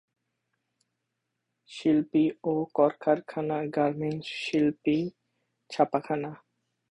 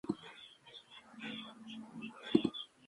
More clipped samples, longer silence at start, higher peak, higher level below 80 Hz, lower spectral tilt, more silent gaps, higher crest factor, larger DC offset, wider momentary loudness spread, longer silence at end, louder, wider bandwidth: neither; first, 1.7 s vs 0.05 s; first, -8 dBFS vs -12 dBFS; first, -68 dBFS vs -76 dBFS; about the same, -7 dB/octave vs -6 dB/octave; neither; second, 22 dB vs 28 dB; neither; second, 8 LU vs 20 LU; first, 0.55 s vs 0 s; first, -28 LUFS vs -40 LUFS; second, 10 kHz vs 11.5 kHz